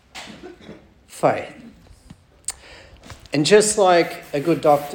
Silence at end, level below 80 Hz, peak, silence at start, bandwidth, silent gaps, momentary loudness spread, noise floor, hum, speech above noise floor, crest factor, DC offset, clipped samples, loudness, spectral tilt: 0 s; -54 dBFS; -2 dBFS; 0.15 s; 18 kHz; none; 24 LU; -48 dBFS; none; 31 dB; 20 dB; under 0.1%; under 0.1%; -19 LUFS; -4 dB/octave